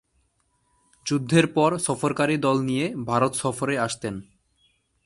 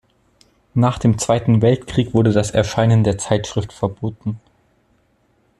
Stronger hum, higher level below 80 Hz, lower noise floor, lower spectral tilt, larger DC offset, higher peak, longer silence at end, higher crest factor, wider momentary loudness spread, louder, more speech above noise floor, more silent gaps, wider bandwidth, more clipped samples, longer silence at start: neither; second, -60 dBFS vs -44 dBFS; first, -69 dBFS vs -61 dBFS; second, -5 dB/octave vs -6.5 dB/octave; neither; second, -6 dBFS vs 0 dBFS; second, 0.85 s vs 1.2 s; about the same, 20 dB vs 18 dB; about the same, 9 LU vs 10 LU; second, -24 LUFS vs -18 LUFS; about the same, 46 dB vs 44 dB; neither; about the same, 11.5 kHz vs 11.5 kHz; neither; first, 1.05 s vs 0.75 s